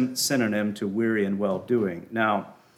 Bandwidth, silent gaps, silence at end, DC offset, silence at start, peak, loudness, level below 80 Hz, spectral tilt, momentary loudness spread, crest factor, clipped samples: 17.5 kHz; none; 0.25 s; under 0.1%; 0 s; -10 dBFS; -26 LUFS; -72 dBFS; -4.5 dB/octave; 4 LU; 16 dB; under 0.1%